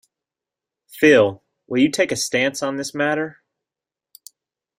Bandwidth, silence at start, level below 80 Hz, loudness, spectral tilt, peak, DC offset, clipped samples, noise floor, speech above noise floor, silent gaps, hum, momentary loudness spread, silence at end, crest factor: 16 kHz; 0.95 s; -62 dBFS; -19 LUFS; -4 dB/octave; -2 dBFS; under 0.1%; under 0.1%; -89 dBFS; 70 dB; none; none; 11 LU; 1.5 s; 20 dB